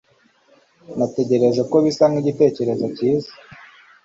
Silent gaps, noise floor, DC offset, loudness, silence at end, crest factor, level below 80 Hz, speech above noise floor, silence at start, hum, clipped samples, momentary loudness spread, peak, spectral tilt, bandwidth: none; -57 dBFS; under 0.1%; -19 LUFS; 0.5 s; 16 dB; -62 dBFS; 39 dB; 0.9 s; none; under 0.1%; 7 LU; -4 dBFS; -7 dB/octave; 7.8 kHz